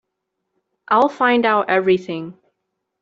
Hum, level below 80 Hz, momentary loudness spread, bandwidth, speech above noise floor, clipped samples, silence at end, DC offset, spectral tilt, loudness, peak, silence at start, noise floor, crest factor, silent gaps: none; -64 dBFS; 14 LU; 7.6 kHz; 60 dB; under 0.1%; 0.7 s; under 0.1%; -6.5 dB/octave; -17 LUFS; -4 dBFS; 0.9 s; -77 dBFS; 16 dB; none